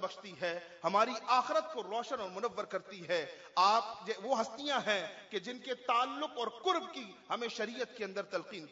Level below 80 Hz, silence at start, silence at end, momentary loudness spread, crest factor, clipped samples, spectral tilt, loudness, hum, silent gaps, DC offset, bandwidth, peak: -86 dBFS; 0 s; 0 s; 11 LU; 20 dB; under 0.1%; -1 dB/octave; -35 LUFS; none; none; under 0.1%; 7.4 kHz; -16 dBFS